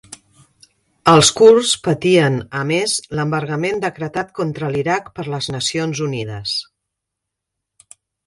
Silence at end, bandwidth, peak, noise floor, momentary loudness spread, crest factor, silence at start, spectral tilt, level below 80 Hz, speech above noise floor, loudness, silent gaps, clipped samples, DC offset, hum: 1.65 s; 11.5 kHz; 0 dBFS; -81 dBFS; 13 LU; 18 dB; 0.1 s; -4 dB/octave; -52 dBFS; 64 dB; -17 LUFS; none; under 0.1%; under 0.1%; none